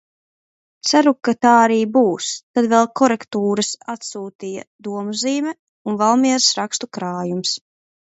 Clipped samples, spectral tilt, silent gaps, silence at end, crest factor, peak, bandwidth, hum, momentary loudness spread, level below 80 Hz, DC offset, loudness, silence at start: under 0.1%; -3.5 dB/octave; 2.43-2.54 s, 4.35-4.39 s, 4.67-4.79 s, 5.59-5.85 s; 0.55 s; 18 dB; 0 dBFS; 8.2 kHz; none; 15 LU; -68 dBFS; under 0.1%; -18 LUFS; 0.85 s